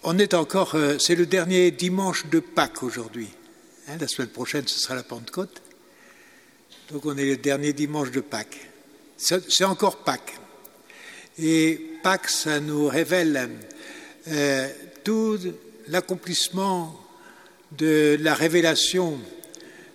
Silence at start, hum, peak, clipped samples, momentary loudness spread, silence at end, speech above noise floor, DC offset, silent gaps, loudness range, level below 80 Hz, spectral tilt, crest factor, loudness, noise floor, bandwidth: 0.05 s; none; -4 dBFS; under 0.1%; 20 LU; 0.1 s; 30 dB; under 0.1%; none; 7 LU; -70 dBFS; -3.5 dB/octave; 22 dB; -23 LUFS; -54 dBFS; 16.5 kHz